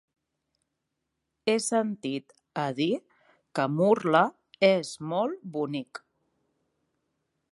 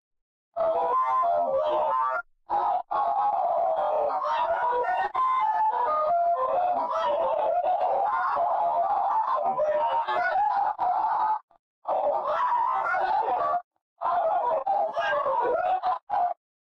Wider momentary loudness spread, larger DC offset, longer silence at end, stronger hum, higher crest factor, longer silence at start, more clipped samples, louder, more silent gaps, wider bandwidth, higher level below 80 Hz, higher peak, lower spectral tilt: first, 12 LU vs 4 LU; neither; first, 1.55 s vs 0.4 s; neither; first, 22 dB vs 8 dB; first, 1.45 s vs 0.55 s; neither; about the same, -27 LUFS vs -26 LUFS; second, none vs 11.43-11.48 s, 11.59-11.82 s, 13.64-13.71 s, 13.82-13.96 s, 16.03-16.07 s; first, 11.5 kHz vs 6.4 kHz; second, -80 dBFS vs -66 dBFS; first, -8 dBFS vs -18 dBFS; about the same, -5 dB/octave vs -4.5 dB/octave